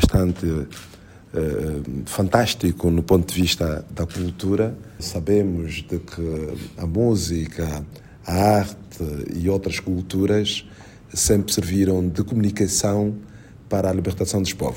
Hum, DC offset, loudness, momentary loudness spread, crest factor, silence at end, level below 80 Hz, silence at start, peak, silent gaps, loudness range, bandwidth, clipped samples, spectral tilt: none; under 0.1%; -22 LUFS; 11 LU; 22 dB; 0 s; -38 dBFS; 0 s; 0 dBFS; none; 3 LU; 16.5 kHz; under 0.1%; -5 dB/octave